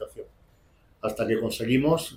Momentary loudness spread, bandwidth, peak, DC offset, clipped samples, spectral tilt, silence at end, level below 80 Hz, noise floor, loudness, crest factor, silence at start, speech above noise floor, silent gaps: 16 LU; 16.5 kHz; -10 dBFS; under 0.1%; under 0.1%; -5.5 dB/octave; 0 s; -54 dBFS; -60 dBFS; -26 LUFS; 16 dB; 0 s; 35 dB; none